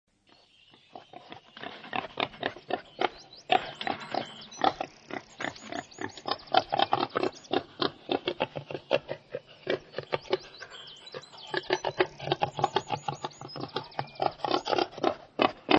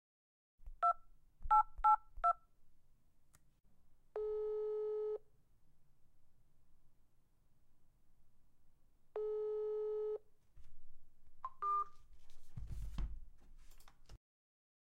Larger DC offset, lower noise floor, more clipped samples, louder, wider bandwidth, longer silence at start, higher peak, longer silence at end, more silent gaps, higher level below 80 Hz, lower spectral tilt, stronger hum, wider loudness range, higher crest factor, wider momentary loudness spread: neither; second, -62 dBFS vs -68 dBFS; neither; first, -32 LUFS vs -39 LUFS; second, 8.6 kHz vs 9.6 kHz; first, 0.95 s vs 0.6 s; first, -4 dBFS vs -20 dBFS; second, 0 s vs 0.7 s; neither; second, -68 dBFS vs -56 dBFS; second, -4.5 dB/octave vs -6.5 dB/octave; neither; second, 4 LU vs 11 LU; first, 28 dB vs 22 dB; second, 15 LU vs 18 LU